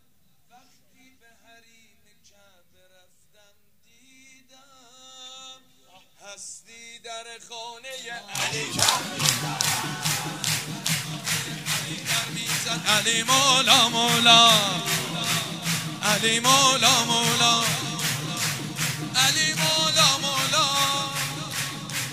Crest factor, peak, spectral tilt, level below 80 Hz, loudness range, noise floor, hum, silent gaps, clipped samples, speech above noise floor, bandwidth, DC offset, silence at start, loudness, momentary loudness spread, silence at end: 26 dB; 0 dBFS; -1.5 dB/octave; -64 dBFS; 16 LU; -66 dBFS; none; none; under 0.1%; 45 dB; 16 kHz; 0.1%; 5.05 s; -21 LUFS; 21 LU; 0 s